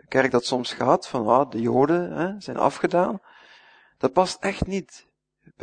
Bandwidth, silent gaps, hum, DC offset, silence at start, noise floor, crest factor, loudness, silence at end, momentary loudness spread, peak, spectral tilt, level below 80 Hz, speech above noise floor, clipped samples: 9.6 kHz; none; none; under 0.1%; 0.1 s; -59 dBFS; 20 dB; -23 LUFS; 0 s; 8 LU; -4 dBFS; -5.5 dB/octave; -52 dBFS; 37 dB; under 0.1%